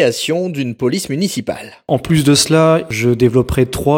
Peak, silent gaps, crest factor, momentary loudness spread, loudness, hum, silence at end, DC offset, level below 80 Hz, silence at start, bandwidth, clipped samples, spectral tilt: 0 dBFS; none; 14 dB; 9 LU; -15 LUFS; none; 0 s; under 0.1%; -36 dBFS; 0 s; 17 kHz; under 0.1%; -5 dB/octave